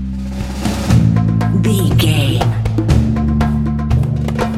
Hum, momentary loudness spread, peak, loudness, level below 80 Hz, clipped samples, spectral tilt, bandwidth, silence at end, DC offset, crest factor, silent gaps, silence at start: none; 7 LU; 0 dBFS; -15 LUFS; -22 dBFS; under 0.1%; -6.5 dB/octave; 15 kHz; 0 s; under 0.1%; 14 dB; none; 0 s